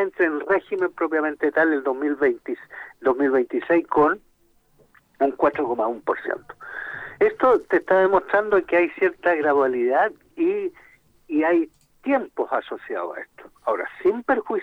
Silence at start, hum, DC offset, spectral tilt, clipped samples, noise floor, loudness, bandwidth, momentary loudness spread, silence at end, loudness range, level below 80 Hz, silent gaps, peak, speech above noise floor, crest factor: 0 s; none; under 0.1%; -7 dB/octave; under 0.1%; -61 dBFS; -22 LUFS; 5 kHz; 13 LU; 0 s; 5 LU; -60 dBFS; none; -6 dBFS; 39 dB; 16 dB